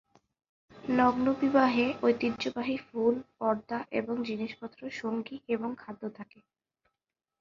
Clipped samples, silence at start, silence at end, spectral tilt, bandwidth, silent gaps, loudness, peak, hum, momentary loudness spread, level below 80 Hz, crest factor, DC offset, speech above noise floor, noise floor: under 0.1%; 0.75 s; 1.15 s; -6 dB/octave; 7.2 kHz; none; -30 LUFS; -10 dBFS; none; 16 LU; -66 dBFS; 20 dB; under 0.1%; 59 dB; -89 dBFS